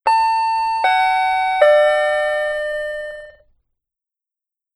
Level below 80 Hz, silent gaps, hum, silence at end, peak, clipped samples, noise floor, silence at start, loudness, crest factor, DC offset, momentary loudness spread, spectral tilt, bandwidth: -54 dBFS; none; none; 1.45 s; -2 dBFS; under 0.1%; -84 dBFS; 0.05 s; -16 LUFS; 16 dB; under 0.1%; 13 LU; -0.5 dB/octave; 11 kHz